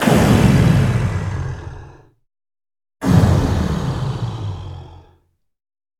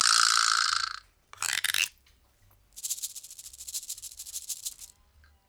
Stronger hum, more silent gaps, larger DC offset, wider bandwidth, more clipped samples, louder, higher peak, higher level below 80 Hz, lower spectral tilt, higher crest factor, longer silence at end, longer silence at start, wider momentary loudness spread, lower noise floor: neither; neither; neither; second, 17 kHz vs over 20 kHz; neither; first, -17 LUFS vs -28 LUFS; first, 0 dBFS vs -8 dBFS; first, -32 dBFS vs -66 dBFS; first, -7 dB/octave vs 4 dB/octave; second, 18 dB vs 24 dB; first, 1.05 s vs 0.65 s; about the same, 0 s vs 0 s; about the same, 19 LU vs 20 LU; second, -59 dBFS vs -63 dBFS